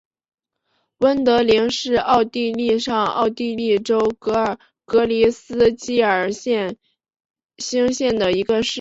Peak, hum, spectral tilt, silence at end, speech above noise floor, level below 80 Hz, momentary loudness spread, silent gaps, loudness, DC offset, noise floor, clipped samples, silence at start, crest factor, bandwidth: -4 dBFS; none; -4 dB/octave; 0 s; 52 dB; -52 dBFS; 6 LU; 7.25-7.34 s, 7.45-7.49 s; -19 LUFS; under 0.1%; -70 dBFS; under 0.1%; 1 s; 16 dB; 8 kHz